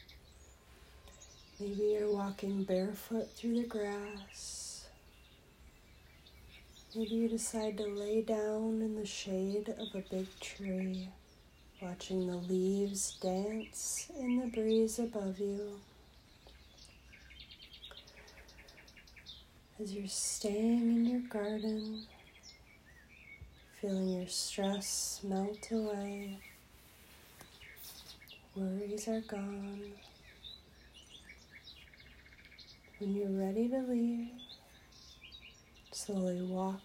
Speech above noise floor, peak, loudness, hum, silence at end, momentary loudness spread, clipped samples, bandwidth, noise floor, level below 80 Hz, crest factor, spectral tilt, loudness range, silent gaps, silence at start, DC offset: 25 dB; -22 dBFS; -37 LUFS; none; 0 s; 22 LU; under 0.1%; 16 kHz; -61 dBFS; -64 dBFS; 18 dB; -4.5 dB/octave; 11 LU; none; 0 s; under 0.1%